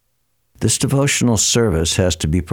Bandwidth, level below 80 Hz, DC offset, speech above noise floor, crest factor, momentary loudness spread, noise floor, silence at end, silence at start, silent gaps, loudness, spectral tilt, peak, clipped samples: 17.5 kHz; -34 dBFS; under 0.1%; 52 dB; 14 dB; 5 LU; -68 dBFS; 0 s; 0.6 s; none; -16 LUFS; -4 dB/octave; -4 dBFS; under 0.1%